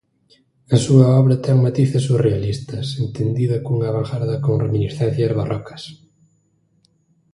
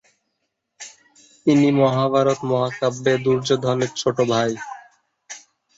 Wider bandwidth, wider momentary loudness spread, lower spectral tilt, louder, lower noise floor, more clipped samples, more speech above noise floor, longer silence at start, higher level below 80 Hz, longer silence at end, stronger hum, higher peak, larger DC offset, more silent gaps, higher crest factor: first, 11.5 kHz vs 8 kHz; second, 12 LU vs 22 LU; first, -7.5 dB/octave vs -5.5 dB/octave; about the same, -18 LUFS vs -20 LUFS; second, -62 dBFS vs -75 dBFS; neither; second, 45 dB vs 57 dB; about the same, 0.7 s vs 0.8 s; first, -48 dBFS vs -62 dBFS; first, 1.4 s vs 0.4 s; neither; first, 0 dBFS vs -4 dBFS; neither; neither; about the same, 18 dB vs 16 dB